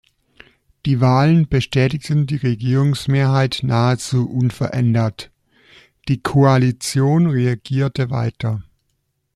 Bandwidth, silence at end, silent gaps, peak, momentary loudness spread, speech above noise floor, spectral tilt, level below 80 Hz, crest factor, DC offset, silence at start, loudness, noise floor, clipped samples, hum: 12.5 kHz; 0.75 s; none; -4 dBFS; 10 LU; 53 dB; -7 dB/octave; -44 dBFS; 14 dB; under 0.1%; 0.85 s; -18 LUFS; -69 dBFS; under 0.1%; none